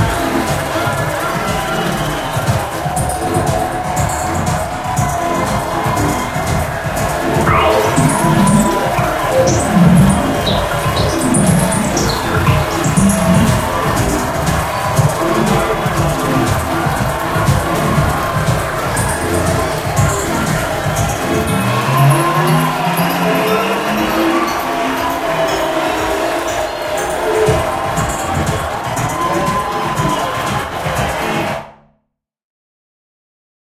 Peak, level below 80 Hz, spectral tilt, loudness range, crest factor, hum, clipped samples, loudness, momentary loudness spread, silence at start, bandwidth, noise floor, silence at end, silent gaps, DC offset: 0 dBFS; -30 dBFS; -5 dB/octave; 4 LU; 14 dB; none; under 0.1%; -15 LUFS; 6 LU; 0 s; 16 kHz; -69 dBFS; 1.9 s; none; under 0.1%